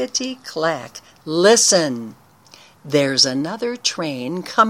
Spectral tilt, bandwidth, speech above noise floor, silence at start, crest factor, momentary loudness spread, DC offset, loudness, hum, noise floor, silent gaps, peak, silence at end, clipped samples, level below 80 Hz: -2.5 dB/octave; 16.5 kHz; 29 dB; 0 s; 20 dB; 17 LU; under 0.1%; -18 LUFS; none; -48 dBFS; none; 0 dBFS; 0 s; under 0.1%; -68 dBFS